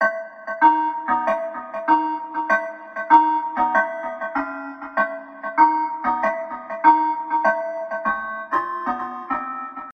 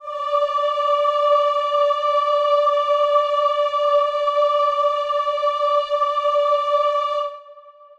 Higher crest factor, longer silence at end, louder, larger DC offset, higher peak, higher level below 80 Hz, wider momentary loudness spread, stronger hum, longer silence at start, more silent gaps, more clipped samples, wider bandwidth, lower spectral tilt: first, 20 dB vs 12 dB; second, 0 s vs 0.3 s; about the same, -21 LUFS vs -19 LUFS; neither; first, -2 dBFS vs -6 dBFS; first, -62 dBFS vs -68 dBFS; first, 13 LU vs 4 LU; neither; about the same, 0 s vs 0 s; neither; neither; second, 6.2 kHz vs 8 kHz; first, -5.5 dB/octave vs 0.5 dB/octave